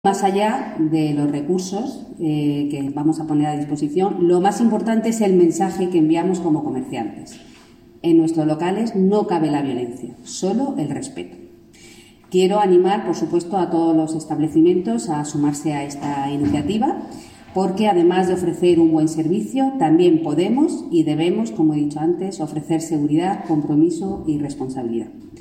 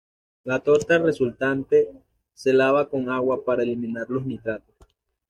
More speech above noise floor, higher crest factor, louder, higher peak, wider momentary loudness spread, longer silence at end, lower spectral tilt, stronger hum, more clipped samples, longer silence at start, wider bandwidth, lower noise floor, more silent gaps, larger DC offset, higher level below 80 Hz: second, 28 dB vs 36 dB; about the same, 14 dB vs 18 dB; first, -19 LUFS vs -23 LUFS; about the same, -4 dBFS vs -6 dBFS; about the same, 11 LU vs 11 LU; second, 0 s vs 0.7 s; about the same, -6.5 dB/octave vs -6.5 dB/octave; neither; neither; second, 0.05 s vs 0.45 s; first, 14 kHz vs 11 kHz; second, -46 dBFS vs -58 dBFS; neither; neither; about the same, -56 dBFS vs -60 dBFS